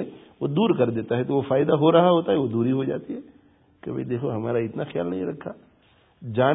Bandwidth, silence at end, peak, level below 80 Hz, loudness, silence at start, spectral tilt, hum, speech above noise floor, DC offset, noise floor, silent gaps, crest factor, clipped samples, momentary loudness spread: 3.9 kHz; 0 s; -4 dBFS; -62 dBFS; -23 LUFS; 0 s; -12 dB/octave; none; 37 dB; under 0.1%; -59 dBFS; none; 20 dB; under 0.1%; 19 LU